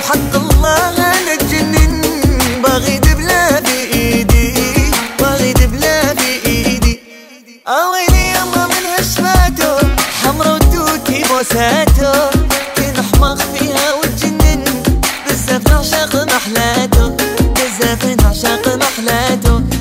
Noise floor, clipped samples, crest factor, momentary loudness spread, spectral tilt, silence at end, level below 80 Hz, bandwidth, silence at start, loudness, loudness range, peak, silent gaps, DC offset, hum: -38 dBFS; under 0.1%; 12 dB; 3 LU; -4 dB/octave; 0 s; -16 dBFS; 16.5 kHz; 0 s; -12 LUFS; 2 LU; 0 dBFS; none; under 0.1%; none